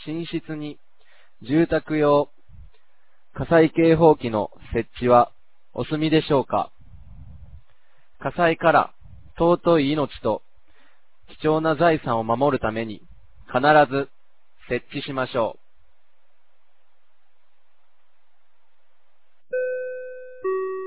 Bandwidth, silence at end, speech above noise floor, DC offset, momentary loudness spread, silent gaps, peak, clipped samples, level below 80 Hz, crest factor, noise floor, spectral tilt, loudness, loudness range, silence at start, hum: 4 kHz; 0 s; 50 dB; 0.8%; 16 LU; none; -2 dBFS; under 0.1%; -50 dBFS; 20 dB; -70 dBFS; -10.5 dB/octave; -22 LUFS; 12 LU; 0 s; none